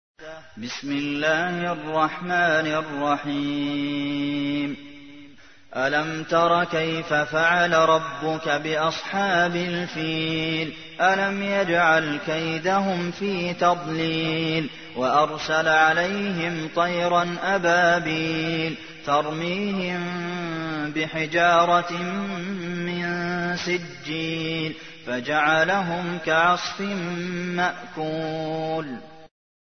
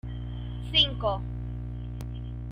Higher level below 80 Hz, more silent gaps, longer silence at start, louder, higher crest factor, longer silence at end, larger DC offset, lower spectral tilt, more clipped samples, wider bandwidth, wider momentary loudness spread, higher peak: second, -60 dBFS vs -38 dBFS; neither; first, 0.2 s vs 0.05 s; first, -23 LUFS vs -29 LUFS; about the same, 18 dB vs 22 dB; first, 0.4 s vs 0 s; first, 0.3% vs under 0.1%; about the same, -5 dB/octave vs -5.5 dB/octave; neither; second, 6.6 kHz vs 9.6 kHz; second, 10 LU vs 15 LU; first, -6 dBFS vs -10 dBFS